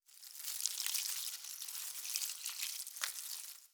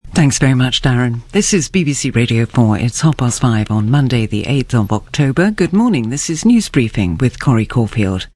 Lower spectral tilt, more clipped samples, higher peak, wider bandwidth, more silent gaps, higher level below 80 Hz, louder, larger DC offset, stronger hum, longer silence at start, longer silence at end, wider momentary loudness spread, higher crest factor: second, 7.5 dB/octave vs -5.5 dB/octave; neither; second, -10 dBFS vs 0 dBFS; first, over 20 kHz vs 12 kHz; neither; second, under -90 dBFS vs -34 dBFS; second, -39 LUFS vs -14 LUFS; neither; neither; about the same, 0.1 s vs 0.05 s; about the same, 0.05 s vs 0.1 s; first, 8 LU vs 4 LU; first, 32 dB vs 14 dB